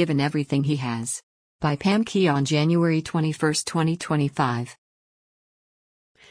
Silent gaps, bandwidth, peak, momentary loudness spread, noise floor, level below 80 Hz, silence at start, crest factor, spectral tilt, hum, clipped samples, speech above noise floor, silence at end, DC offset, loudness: 1.23-1.59 s; 10.5 kHz; -8 dBFS; 8 LU; under -90 dBFS; -60 dBFS; 0 s; 16 dB; -5.5 dB/octave; none; under 0.1%; over 67 dB; 1.6 s; under 0.1%; -23 LUFS